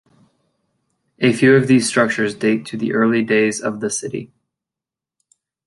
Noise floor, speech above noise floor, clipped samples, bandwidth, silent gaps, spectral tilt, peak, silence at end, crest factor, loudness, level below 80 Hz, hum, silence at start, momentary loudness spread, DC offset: -88 dBFS; 71 dB; under 0.1%; 11.5 kHz; none; -5 dB/octave; -2 dBFS; 1.4 s; 18 dB; -17 LUFS; -62 dBFS; none; 1.2 s; 10 LU; under 0.1%